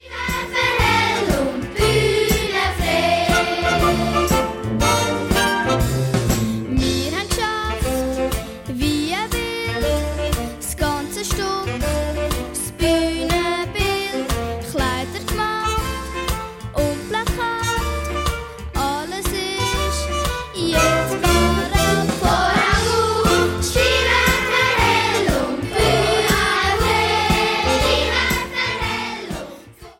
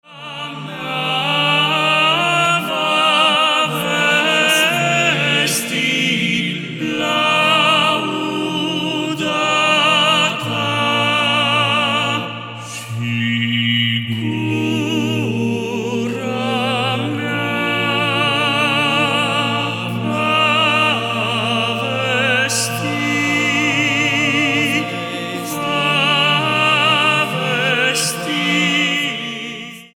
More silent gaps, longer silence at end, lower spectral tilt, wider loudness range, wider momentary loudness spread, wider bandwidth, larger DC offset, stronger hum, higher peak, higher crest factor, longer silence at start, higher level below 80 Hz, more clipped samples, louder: neither; about the same, 0.1 s vs 0.1 s; about the same, -4 dB/octave vs -3.5 dB/octave; about the same, 6 LU vs 5 LU; about the same, 8 LU vs 9 LU; about the same, 16.5 kHz vs 18 kHz; neither; neither; second, -4 dBFS vs 0 dBFS; about the same, 16 dB vs 16 dB; about the same, 0.05 s vs 0.1 s; first, -28 dBFS vs -64 dBFS; neither; second, -19 LUFS vs -15 LUFS